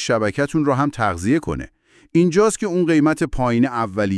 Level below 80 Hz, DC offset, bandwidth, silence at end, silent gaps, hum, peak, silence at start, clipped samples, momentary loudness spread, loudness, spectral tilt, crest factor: -40 dBFS; under 0.1%; 12 kHz; 0 s; none; none; -4 dBFS; 0 s; under 0.1%; 5 LU; -19 LUFS; -6 dB/octave; 14 dB